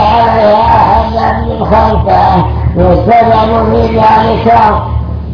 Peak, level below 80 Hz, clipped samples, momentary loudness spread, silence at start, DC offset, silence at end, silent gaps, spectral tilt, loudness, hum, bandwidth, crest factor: 0 dBFS; -18 dBFS; 2%; 6 LU; 0 s; under 0.1%; 0 s; none; -8.5 dB/octave; -8 LUFS; none; 5.4 kHz; 8 dB